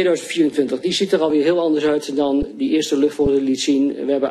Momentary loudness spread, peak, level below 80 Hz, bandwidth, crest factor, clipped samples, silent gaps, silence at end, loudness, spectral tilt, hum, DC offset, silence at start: 3 LU; -4 dBFS; -44 dBFS; 13 kHz; 14 dB; under 0.1%; none; 0 s; -18 LUFS; -4.5 dB/octave; none; under 0.1%; 0 s